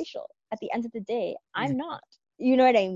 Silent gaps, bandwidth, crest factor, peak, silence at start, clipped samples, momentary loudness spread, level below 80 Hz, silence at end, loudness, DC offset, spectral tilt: none; 7.4 kHz; 18 dB; -10 dBFS; 0 s; under 0.1%; 18 LU; -72 dBFS; 0 s; -27 LUFS; under 0.1%; -6.5 dB/octave